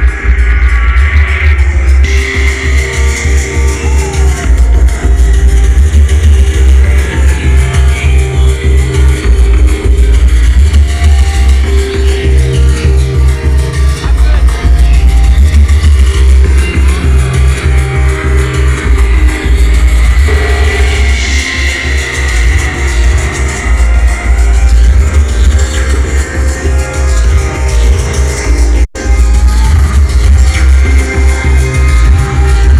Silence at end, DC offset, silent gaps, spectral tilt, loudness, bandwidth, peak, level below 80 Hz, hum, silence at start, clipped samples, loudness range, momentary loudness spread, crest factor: 0 s; 2%; none; -5.5 dB/octave; -9 LUFS; 12 kHz; 0 dBFS; -6 dBFS; none; 0 s; 3%; 2 LU; 4 LU; 6 dB